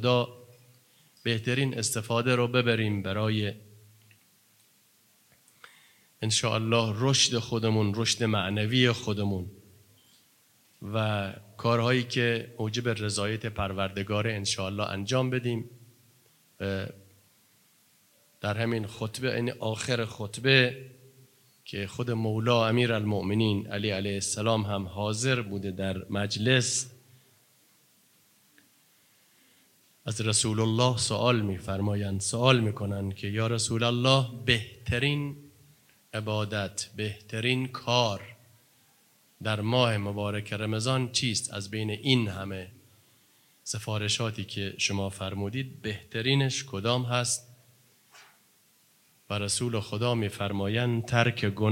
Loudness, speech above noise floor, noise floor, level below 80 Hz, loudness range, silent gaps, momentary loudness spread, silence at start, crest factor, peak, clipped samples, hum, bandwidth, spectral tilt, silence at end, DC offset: -28 LUFS; 36 dB; -64 dBFS; -64 dBFS; 6 LU; none; 11 LU; 0 s; 24 dB; -6 dBFS; under 0.1%; none; 16.5 kHz; -4.5 dB/octave; 0 s; under 0.1%